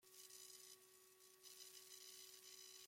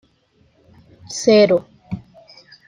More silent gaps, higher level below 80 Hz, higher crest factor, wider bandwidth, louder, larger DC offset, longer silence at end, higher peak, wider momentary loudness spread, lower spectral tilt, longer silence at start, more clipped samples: neither; second, under -90 dBFS vs -58 dBFS; about the same, 20 dB vs 18 dB; first, 16.5 kHz vs 10.5 kHz; second, -60 LUFS vs -15 LUFS; neither; second, 0 s vs 0.7 s; second, -44 dBFS vs -2 dBFS; second, 8 LU vs 20 LU; second, 1 dB/octave vs -4.5 dB/octave; second, 0 s vs 1.1 s; neither